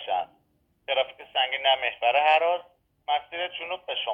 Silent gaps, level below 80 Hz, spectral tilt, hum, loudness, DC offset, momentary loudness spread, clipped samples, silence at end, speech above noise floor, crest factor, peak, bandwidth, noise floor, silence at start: none; -72 dBFS; -2.5 dB/octave; none; -25 LUFS; under 0.1%; 12 LU; under 0.1%; 0 s; 44 dB; 18 dB; -8 dBFS; 5.4 kHz; -69 dBFS; 0 s